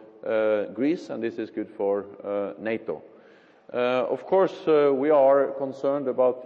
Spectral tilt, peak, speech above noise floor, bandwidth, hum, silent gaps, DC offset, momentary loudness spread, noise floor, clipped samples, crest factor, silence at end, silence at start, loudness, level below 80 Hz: -7.5 dB/octave; -8 dBFS; 30 dB; 7 kHz; none; none; under 0.1%; 12 LU; -54 dBFS; under 0.1%; 16 dB; 0 s; 0 s; -25 LUFS; -78 dBFS